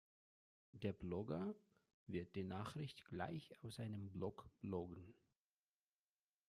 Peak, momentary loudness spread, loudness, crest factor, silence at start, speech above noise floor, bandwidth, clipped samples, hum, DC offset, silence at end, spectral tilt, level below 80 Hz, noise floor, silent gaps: -30 dBFS; 11 LU; -50 LUFS; 20 dB; 0.75 s; over 41 dB; 13.5 kHz; under 0.1%; none; under 0.1%; 1.35 s; -7.5 dB/octave; -76 dBFS; under -90 dBFS; 1.94-2.06 s